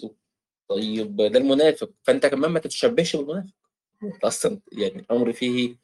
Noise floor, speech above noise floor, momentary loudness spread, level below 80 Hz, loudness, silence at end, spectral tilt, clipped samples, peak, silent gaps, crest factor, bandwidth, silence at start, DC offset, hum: -85 dBFS; 62 dB; 12 LU; -66 dBFS; -23 LUFS; 0.1 s; -4.5 dB/octave; under 0.1%; -6 dBFS; none; 18 dB; 12.5 kHz; 0 s; under 0.1%; none